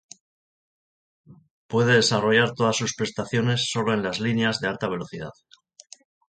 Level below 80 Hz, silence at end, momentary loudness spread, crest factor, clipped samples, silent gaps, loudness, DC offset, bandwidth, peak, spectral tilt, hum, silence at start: -60 dBFS; 1.05 s; 11 LU; 18 dB; under 0.1%; 1.50-1.69 s; -23 LUFS; under 0.1%; 9.4 kHz; -6 dBFS; -4.5 dB/octave; none; 1.3 s